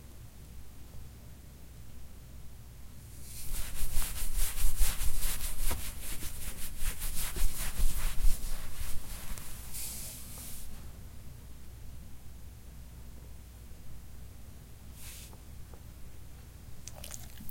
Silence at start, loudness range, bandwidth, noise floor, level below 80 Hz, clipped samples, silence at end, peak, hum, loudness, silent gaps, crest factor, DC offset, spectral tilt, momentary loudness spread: 0.05 s; 14 LU; 16.5 kHz; -49 dBFS; -36 dBFS; under 0.1%; 0 s; -10 dBFS; none; -40 LUFS; none; 20 dB; under 0.1%; -2.5 dB/octave; 16 LU